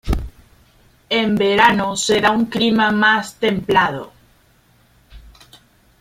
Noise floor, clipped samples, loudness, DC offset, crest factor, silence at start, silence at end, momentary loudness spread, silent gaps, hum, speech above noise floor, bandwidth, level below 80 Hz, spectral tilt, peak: -55 dBFS; under 0.1%; -16 LUFS; under 0.1%; 18 dB; 0.05 s; 0.8 s; 10 LU; none; none; 39 dB; 16 kHz; -36 dBFS; -4 dB/octave; -2 dBFS